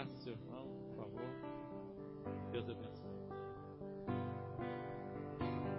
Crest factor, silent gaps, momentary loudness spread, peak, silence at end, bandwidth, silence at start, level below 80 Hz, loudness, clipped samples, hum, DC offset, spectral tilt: 18 dB; none; 7 LU; -28 dBFS; 0 s; 5.6 kHz; 0 s; -68 dBFS; -47 LUFS; under 0.1%; none; under 0.1%; -6.5 dB/octave